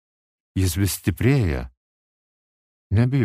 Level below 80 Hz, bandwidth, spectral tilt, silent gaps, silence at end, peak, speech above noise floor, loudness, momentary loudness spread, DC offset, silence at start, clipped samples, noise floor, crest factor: -38 dBFS; 15.5 kHz; -6 dB/octave; 1.77-2.90 s; 0 s; -6 dBFS; over 70 dB; -22 LUFS; 11 LU; under 0.1%; 0.55 s; under 0.1%; under -90 dBFS; 18 dB